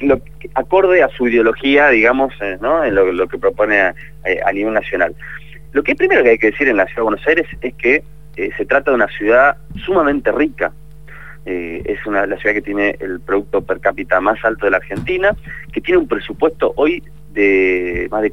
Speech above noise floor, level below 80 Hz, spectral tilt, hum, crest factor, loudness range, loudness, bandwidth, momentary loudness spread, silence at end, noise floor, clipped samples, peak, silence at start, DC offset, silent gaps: 21 dB; -40 dBFS; -7 dB/octave; none; 16 dB; 5 LU; -15 LUFS; 10 kHz; 12 LU; 0 s; -36 dBFS; under 0.1%; 0 dBFS; 0 s; 1%; none